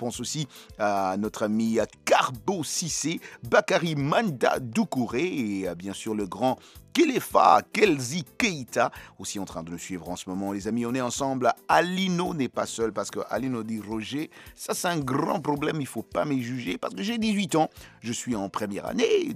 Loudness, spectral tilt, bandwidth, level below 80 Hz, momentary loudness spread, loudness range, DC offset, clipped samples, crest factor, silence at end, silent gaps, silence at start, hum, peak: -27 LUFS; -4.5 dB/octave; 15.5 kHz; -58 dBFS; 11 LU; 5 LU; under 0.1%; under 0.1%; 24 dB; 0 s; none; 0 s; none; -4 dBFS